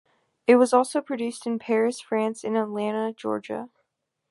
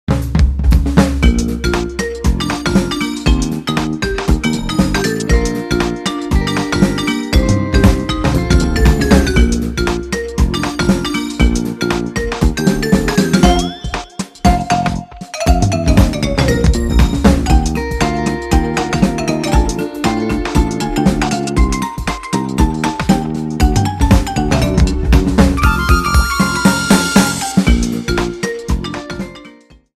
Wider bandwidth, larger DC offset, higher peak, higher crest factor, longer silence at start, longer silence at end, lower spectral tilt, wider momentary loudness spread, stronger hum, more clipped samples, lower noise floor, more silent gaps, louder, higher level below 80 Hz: second, 11.5 kHz vs 15 kHz; neither; second, -4 dBFS vs 0 dBFS; first, 20 dB vs 14 dB; first, 0.5 s vs 0.1 s; first, 0.65 s vs 0.5 s; about the same, -5 dB/octave vs -5.5 dB/octave; first, 12 LU vs 7 LU; neither; neither; first, -77 dBFS vs -41 dBFS; neither; second, -24 LUFS vs -15 LUFS; second, -78 dBFS vs -18 dBFS